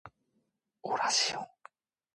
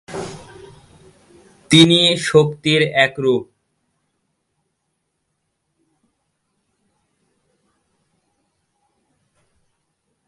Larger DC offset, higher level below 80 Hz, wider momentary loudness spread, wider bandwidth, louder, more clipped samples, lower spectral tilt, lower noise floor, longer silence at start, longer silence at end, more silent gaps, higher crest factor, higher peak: neither; second, -78 dBFS vs -58 dBFS; about the same, 18 LU vs 20 LU; about the same, 11.5 kHz vs 11.5 kHz; second, -30 LUFS vs -14 LUFS; neither; second, 0 dB/octave vs -4.5 dB/octave; first, -79 dBFS vs -73 dBFS; about the same, 0.05 s vs 0.1 s; second, 0.7 s vs 6.85 s; neither; about the same, 20 dB vs 22 dB; second, -16 dBFS vs 0 dBFS